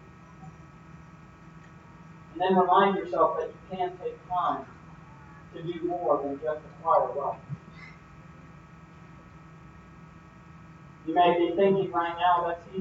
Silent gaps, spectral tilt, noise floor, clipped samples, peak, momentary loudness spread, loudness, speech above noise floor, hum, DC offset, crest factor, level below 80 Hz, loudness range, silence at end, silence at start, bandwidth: none; -7.5 dB/octave; -50 dBFS; under 0.1%; -8 dBFS; 26 LU; -27 LUFS; 23 dB; none; under 0.1%; 20 dB; -60 dBFS; 14 LU; 0 s; 0.05 s; 7.6 kHz